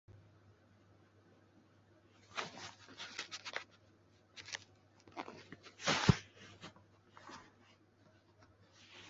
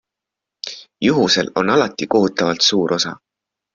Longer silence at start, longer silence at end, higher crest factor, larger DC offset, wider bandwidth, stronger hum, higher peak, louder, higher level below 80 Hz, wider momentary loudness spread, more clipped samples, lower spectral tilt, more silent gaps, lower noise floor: second, 0.1 s vs 0.65 s; second, 0 s vs 0.6 s; first, 34 dB vs 18 dB; neither; about the same, 7.6 kHz vs 7.6 kHz; neither; second, -12 dBFS vs -2 dBFS; second, -40 LUFS vs -16 LUFS; second, -62 dBFS vs -56 dBFS; first, 28 LU vs 16 LU; neither; about the same, -4 dB/octave vs -4 dB/octave; neither; second, -68 dBFS vs -84 dBFS